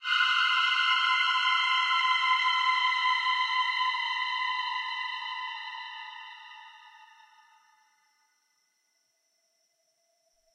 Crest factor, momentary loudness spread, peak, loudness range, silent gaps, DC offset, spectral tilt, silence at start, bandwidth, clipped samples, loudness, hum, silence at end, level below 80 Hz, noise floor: 16 dB; 16 LU; -14 dBFS; 18 LU; none; under 0.1%; 8.5 dB/octave; 0 s; 10 kHz; under 0.1%; -26 LUFS; none; 3.5 s; under -90 dBFS; -74 dBFS